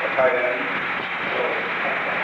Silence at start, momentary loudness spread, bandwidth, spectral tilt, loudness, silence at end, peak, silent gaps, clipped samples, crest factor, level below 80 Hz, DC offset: 0 s; 5 LU; 8.2 kHz; -5 dB/octave; -22 LUFS; 0 s; -8 dBFS; none; under 0.1%; 16 dB; -62 dBFS; under 0.1%